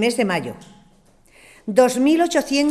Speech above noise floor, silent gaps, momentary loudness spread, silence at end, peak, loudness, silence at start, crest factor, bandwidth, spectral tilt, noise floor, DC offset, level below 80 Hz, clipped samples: 35 dB; none; 18 LU; 0 s; -2 dBFS; -18 LUFS; 0 s; 18 dB; 14.5 kHz; -4 dB/octave; -53 dBFS; under 0.1%; -56 dBFS; under 0.1%